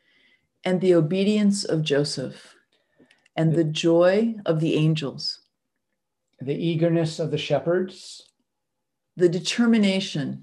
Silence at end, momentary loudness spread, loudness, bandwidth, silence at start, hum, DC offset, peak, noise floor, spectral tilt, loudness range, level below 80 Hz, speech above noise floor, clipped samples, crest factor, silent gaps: 0 s; 12 LU; -23 LUFS; 11.5 kHz; 0.65 s; none; under 0.1%; -8 dBFS; -82 dBFS; -6 dB/octave; 4 LU; -72 dBFS; 60 dB; under 0.1%; 16 dB; none